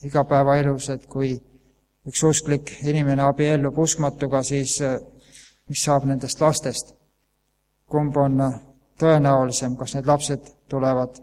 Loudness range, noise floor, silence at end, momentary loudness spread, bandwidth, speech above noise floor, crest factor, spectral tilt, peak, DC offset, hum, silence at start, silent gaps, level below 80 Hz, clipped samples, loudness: 3 LU; -70 dBFS; 0.1 s; 10 LU; 14.5 kHz; 49 dB; 18 dB; -5.5 dB/octave; -4 dBFS; under 0.1%; none; 0.05 s; none; -50 dBFS; under 0.1%; -22 LUFS